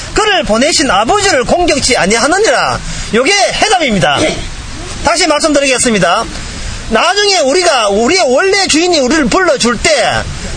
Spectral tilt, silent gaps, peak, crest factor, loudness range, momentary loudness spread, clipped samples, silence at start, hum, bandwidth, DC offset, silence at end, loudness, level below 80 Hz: -2.5 dB/octave; none; 0 dBFS; 10 dB; 2 LU; 8 LU; 0.2%; 0 s; none; 11 kHz; under 0.1%; 0 s; -9 LUFS; -28 dBFS